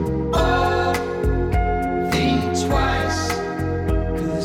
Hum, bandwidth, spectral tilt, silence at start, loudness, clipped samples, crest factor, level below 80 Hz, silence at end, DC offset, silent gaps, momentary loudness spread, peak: none; 17 kHz; -5.5 dB/octave; 0 s; -21 LUFS; under 0.1%; 12 dB; -28 dBFS; 0 s; under 0.1%; none; 5 LU; -8 dBFS